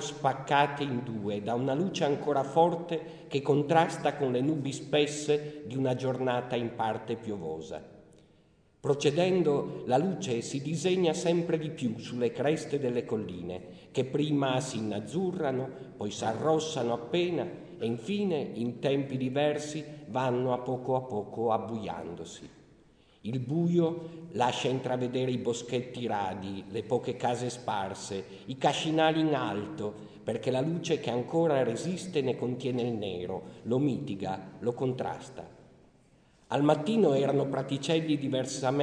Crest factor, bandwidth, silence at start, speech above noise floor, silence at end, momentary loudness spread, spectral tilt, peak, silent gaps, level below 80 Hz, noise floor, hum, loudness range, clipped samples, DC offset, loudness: 20 dB; 10 kHz; 0 s; 34 dB; 0 s; 11 LU; -6 dB/octave; -10 dBFS; none; -68 dBFS; -64 dBFS; none; 4 LU; under 0.1%; under 0.1%; -31 LUFS